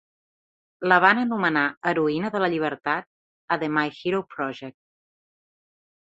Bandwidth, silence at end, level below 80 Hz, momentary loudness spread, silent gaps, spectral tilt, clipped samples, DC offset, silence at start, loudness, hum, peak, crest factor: 8 kHz; 1.35 s; -68 dBFS; 13 LU; 1.77-1.81 s, 3.07-3.48 s; -7 dB/octave; under 0.1%; under 0.1%; 0.8 s; -23 LUFS; none; -2 dBFS; 24 dB